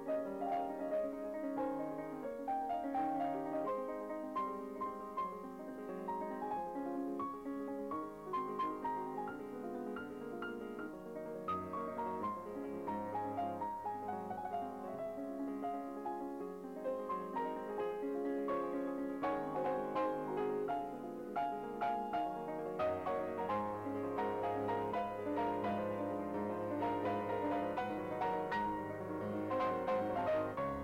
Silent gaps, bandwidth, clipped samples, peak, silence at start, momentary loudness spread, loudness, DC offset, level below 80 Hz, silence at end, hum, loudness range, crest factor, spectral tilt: none; 16.5 kHz; under 0.1%; -28 dBFS; 0 s; 7 LU; -40 LUFS; under 0.1%; -70 dBFS; 0 s; none; 4 LU; 12 dB; -7.5 dB/octave